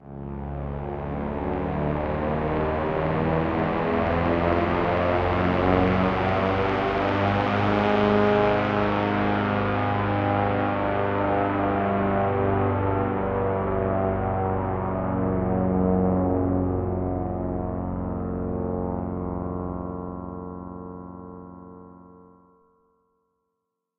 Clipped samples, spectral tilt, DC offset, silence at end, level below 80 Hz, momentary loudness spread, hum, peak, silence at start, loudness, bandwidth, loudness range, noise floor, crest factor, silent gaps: under 0.1%; -9 dB/octave; under 0.1%; 1.75 s; -40 dBFS; 11 LU; none; -6 dBFS; 0.05 s; -24 LUFS; 6.4 kHz; 10 LU; -81 dBFS; 20 dB; none